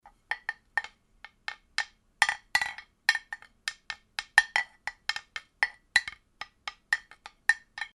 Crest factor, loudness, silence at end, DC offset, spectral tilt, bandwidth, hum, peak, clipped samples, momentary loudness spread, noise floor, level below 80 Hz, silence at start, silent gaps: 30 dB; -30 LUFS; 0.1 s; under 0.1%; 2 dB/octave; 12 kHz; none; -4 dBFS; under 0.1%; 17 LU; -55 dBFS; -66 dBFS; 0.3 s; none